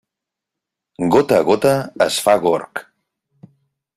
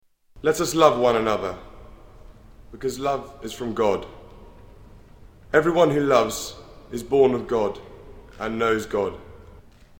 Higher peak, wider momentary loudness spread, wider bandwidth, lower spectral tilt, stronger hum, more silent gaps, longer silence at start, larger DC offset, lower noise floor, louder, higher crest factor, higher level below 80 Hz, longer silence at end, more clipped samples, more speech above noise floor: about the same, 0 dBFS vs -2 dBFS; second, 10 LU vs 17 LU; second, 15.5 kHz vs 18.5 kHz; about the same, -4.5 dB/octave vs -5 dB/octave; neither; neither; first, 1 s vs 0.35 s; neither; first, -84 dBFS vs -48 dBFS; first, -16 LUFS vs -22 LUFS; about the same, 18 dB vs 22 dB; second, -56 dBFS vs -48 dBFS; first, 1.15 s vs 0.4 s; neither; first, 68 dB vs 26 dB